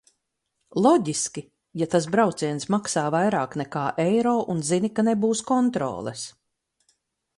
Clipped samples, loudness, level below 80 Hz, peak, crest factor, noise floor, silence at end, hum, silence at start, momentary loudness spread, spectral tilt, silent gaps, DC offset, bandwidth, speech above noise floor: under 0.1%; -24 LUFS; -64 dBFS; -6 dBFS; 18 dB; -78 dBFS; 1.05 s; none; 0.75 s; 11 LU; -5 dB/octave; none; under 0.1%; 11.5 kHz; 55 dB